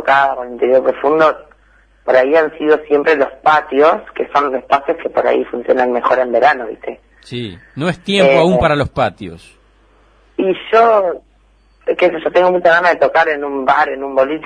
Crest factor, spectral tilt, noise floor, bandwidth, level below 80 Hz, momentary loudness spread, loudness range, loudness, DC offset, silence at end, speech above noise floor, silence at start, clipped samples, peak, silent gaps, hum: 14 dB; -6 dB/octave; -51 dBFS; 10 kHz; -44 dBFS; 15 LU; 3 LU; -13 LUFS; under 0.1%; 0 s; 38 dB; 0 s; under 0.1%; 0 dBFS; none; none